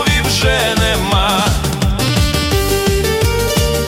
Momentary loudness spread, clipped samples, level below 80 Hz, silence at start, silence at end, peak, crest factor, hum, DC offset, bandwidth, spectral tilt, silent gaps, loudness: 3 LU; under 0.1%; -22 dBFS; 0 s; 0 s; -2 dBFS; 12 dB; none; under 0.1%; 17 kHz; -4 dB/octave; none; -14 LUFS